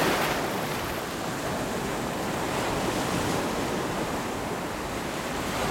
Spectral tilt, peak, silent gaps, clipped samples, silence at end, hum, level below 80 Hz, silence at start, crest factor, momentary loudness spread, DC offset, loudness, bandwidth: -4 dB/octave; -12 dBFS; none; under 0.1%; 0 s; none; -46 dBFS; 0 s; 16 dB; 4 LU; under 0.1%; -29 LUFS; 19 kHz